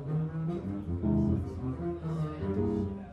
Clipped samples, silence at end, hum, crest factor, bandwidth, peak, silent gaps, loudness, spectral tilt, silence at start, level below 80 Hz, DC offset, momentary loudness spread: under 0.1%; 0 s; none; 14 dB; 6.2 kHz; -18 dBFS; none; -33 LUFS; -10.5 dB/octave; 0 s; -46 dBFS; under 0.1%; 7 LU